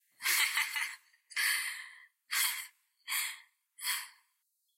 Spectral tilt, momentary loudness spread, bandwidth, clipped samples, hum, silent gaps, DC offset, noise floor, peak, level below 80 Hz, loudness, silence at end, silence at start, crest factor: 5 dB/octave; 21 LU; 16.5 kHz; under 0.1%; none; none; under 0.1%; -79 dBFS; -16 dBFS; under -90 dBFS; -33 LUFS; 0.7 s; 0.2 s; 22 dB